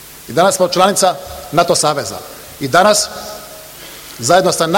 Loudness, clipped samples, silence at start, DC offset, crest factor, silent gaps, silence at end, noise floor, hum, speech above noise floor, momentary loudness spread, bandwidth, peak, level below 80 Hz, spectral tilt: -13 LUFS; under 0.1%; 0 s; under 0.1%; 14 dB; none; 0 s; -33 dBFS; none; 20 dB; 20 LU; 17.5 kHz; 0 dBFS; -48 dBFS; -3 dB/octave